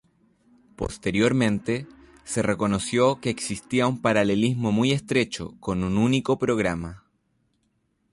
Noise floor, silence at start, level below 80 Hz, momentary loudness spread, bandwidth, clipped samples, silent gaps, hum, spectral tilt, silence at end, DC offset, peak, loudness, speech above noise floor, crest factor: -71 dBFS; 0.8 s; -48 dBFS; 9 LU; 11.5 kHz; under 0.1%; none; none; -5.5 dB/octave; 1.15 s; under 0.1%; -8 dBFS; -24 LUFS; 47 dB; 16 dB